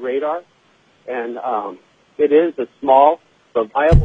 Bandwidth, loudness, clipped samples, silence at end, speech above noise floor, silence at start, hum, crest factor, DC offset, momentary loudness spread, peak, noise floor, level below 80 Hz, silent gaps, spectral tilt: 7.6 kHz; -18 LUFS; under 0.1%; 0 s; 40 dB; 0 s; none; 16 dB; under 0.1%; 16 LU; 0 dBFS; -56 dBFS; -26 dBFS; none; -9 dB/octave